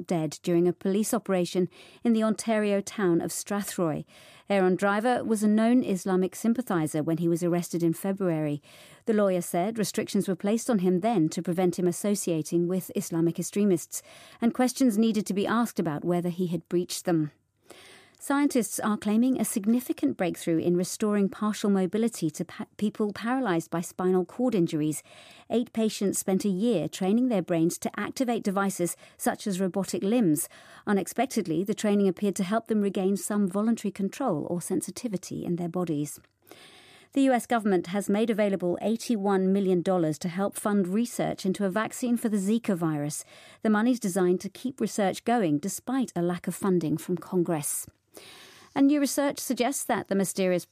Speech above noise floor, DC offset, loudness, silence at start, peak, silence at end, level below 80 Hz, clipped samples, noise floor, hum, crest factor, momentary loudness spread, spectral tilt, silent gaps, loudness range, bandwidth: 27 dB; under 0.1%; -27 LUFS; 0 s; -12 dBFS; 0.1 s; -72 dBFS; under 0.1%; -53 dBFS; none; 14 dB; 7 LU; -5.5 dB/octave; none; 3 LU; 15.5 kHz